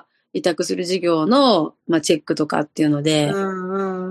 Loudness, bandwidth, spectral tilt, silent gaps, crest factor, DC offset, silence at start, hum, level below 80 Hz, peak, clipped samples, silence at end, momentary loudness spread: -19 LUFS; 12.5 kHz; -5 dB/octave; none; 16 dB; under 0.1%; 0.35 s; none; -66 dBFS; -2 dBFS; under 0.1%; 0 s; 9 LU